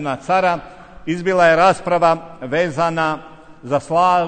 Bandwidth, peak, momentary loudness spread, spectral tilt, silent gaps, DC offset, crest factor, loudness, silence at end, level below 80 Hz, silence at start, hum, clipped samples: 9.4 kHz; -2 dBFS; 11 LU; -5.5 dB/octave; none; under 0.1%; 16 dB; -17 LUFS; 0 s; -50 dBFS; 0 s; none; under 0.1%